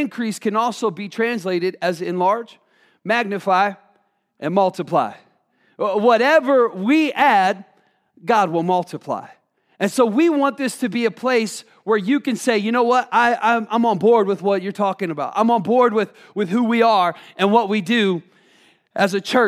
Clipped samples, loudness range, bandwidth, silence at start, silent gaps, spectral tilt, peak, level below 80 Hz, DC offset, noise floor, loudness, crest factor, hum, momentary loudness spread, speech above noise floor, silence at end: under 0.1%; 4 LU; 15 kHz; 0 s; none; -5 dB/octave; -2 dBFS; -80 dBFS; under 0.1%; -63 dBFS; -19 LUFS; 18 dB; none; 10 LU; 45 dB; 0 s